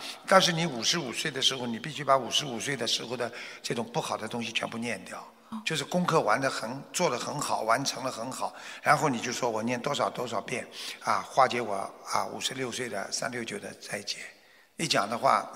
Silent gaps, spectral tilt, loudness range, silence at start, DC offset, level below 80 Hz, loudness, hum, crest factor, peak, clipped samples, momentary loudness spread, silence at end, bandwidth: none; -3 dB/octave; 4 LU; 0 s; under 0.1%; -74 dBFS; -29 LUFS; none; 26 dB; -4 dBFS; under 0.1%; 11 LU; 0 s; 16 kHz